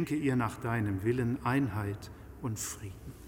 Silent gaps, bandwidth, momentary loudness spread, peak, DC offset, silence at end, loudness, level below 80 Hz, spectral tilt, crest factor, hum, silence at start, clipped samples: none; 16.5 kHz; 13 LU; -16 dBFS; under 0.1%; 0 s; -33 LUFS; -54 dBFS; -6 dB/octave; 16 dB; none; 0 s; under 0.1%